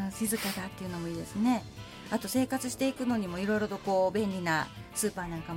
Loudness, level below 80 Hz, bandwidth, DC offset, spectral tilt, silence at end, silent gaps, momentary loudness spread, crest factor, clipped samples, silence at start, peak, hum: -32 LUFS; -56 dBFS; 17 kHz; under 0.1%; -4.5 dB/octave; 0 s; none; 8 LU; 14 dB; under 0.1%; 0 s; -16 dBFS; none